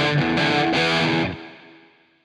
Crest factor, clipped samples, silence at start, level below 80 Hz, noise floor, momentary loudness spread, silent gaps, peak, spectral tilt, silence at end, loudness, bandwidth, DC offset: 14 dB; under 0.1%; 0 s; -52 dBFS; -53 dBFS; 8 LU; none; -8 dBFS; -5.5 dB/octave; 0.7 s; -20 LUFS; 11 kHz; under 0.1%